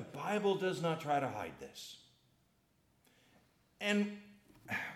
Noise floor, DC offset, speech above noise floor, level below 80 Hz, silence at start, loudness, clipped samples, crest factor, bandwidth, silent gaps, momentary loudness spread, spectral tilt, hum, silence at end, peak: -74 dBFS; under 0.1%; 37 dB; -78 dBFS; 0 s; -37 LUFS; under 0.1%; 18 dB; 15.5 kHz; none; 16 LU; -5 dB/octave; none; 0 s; -22 dBFS